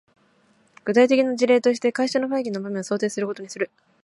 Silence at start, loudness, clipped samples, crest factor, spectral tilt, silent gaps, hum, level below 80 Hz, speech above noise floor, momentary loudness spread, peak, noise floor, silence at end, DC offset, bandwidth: 0.85 s; -22 LUFS; under 0.1%; 18 dB; -4.5 dB/octave; none; none; -74 dBFS; 39 dB; 12 LU; -6 dBFS; -61 dBFS; 0.35 s; under 0.1%; 11.5 kHz